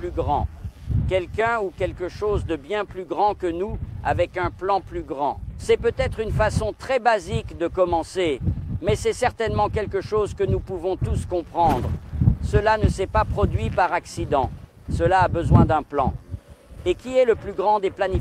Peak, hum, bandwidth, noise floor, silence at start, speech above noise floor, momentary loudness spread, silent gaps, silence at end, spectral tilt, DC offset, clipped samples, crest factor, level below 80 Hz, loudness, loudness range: -4 dBFS; none; 13.5 kHz; -42 dBFS; 0 s; 20 dB; 8 LU; none; 0 s; -7 dB/octave; under 0.1%; under 0.1%; 18 dB; -34 dBFS; -23 LUFS; 4 LU